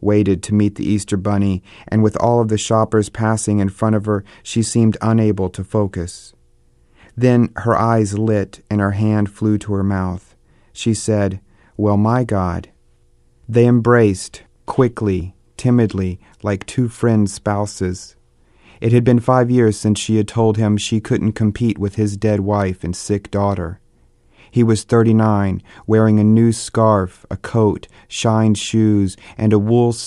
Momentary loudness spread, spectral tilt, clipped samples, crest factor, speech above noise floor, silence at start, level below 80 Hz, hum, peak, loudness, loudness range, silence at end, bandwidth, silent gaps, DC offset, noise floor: 10 LU; -7 dB/octave; under 0.1%; 16 dB; 38 dB; 0 s; -44 dBFS; none; 0 dBFS; -17 LUFS; 4 LU; 0 s; 11.5 kHz; none; under 0.1%; -53 dBFS